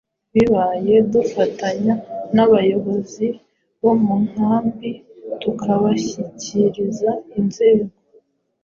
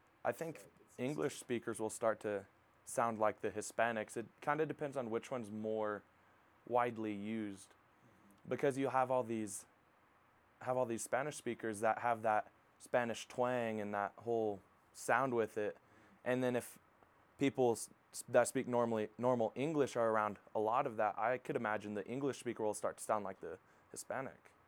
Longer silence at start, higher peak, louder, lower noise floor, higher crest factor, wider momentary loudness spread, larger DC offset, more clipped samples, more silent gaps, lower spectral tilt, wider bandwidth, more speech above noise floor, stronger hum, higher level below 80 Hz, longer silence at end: about the same, 0.35 s vs 0.25 s; first, -4 dBFS vs -16 dBFS; first, -18 LUFS vs -39 LUFS; second, -56 dBFS vs -70 dBFS; second, 16 dB vs 22 dB; about the same, 11 LU vs 12 LU; neither; neither; neither; first, -7 dB/octave vs -5 dB/octave; second, 7.4 kHz vs 20 kHz; first, 38 dB vs 32 dB; neither; first, -54 dBFS vs -84 dBFS; first, 0.75 s vs 0.35 s